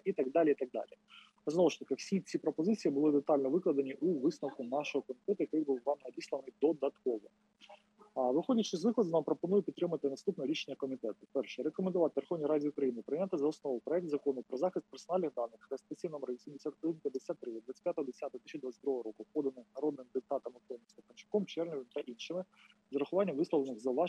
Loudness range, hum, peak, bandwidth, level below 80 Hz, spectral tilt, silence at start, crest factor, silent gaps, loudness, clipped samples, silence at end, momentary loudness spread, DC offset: 7 LU; none; -18 dBFS; 9.6 kHz; under -90 dBFS; -6.5 dB/octave; 0.05 s; 18 dB; none; -36 LUFS; under 0.1%; 0 s; 11 LU; under 0.1%